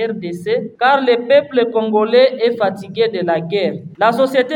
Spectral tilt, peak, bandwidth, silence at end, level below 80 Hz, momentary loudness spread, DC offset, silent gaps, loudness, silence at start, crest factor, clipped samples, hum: -6 dB/octave; 0 dBFS; 16.5 kHz; 0 s; -64 dBFS; 8 LU; under 0.1%; none; -15 LUFS; 0 s; 14 dB; under 0.1%; none